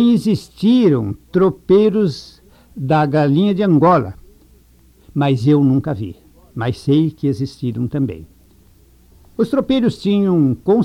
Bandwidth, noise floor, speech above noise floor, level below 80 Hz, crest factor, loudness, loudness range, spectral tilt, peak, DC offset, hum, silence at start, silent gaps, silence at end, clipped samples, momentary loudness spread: 13.5 kHz; -49 dBFS; 34 dB; -48 dBFS; 14 dB; -16 LUFS; 5 LU; -8.5 dB/octave; -2 dBFS; under 0.1%; none; 0 s; none; 0 s; under 0.1%; 12 LU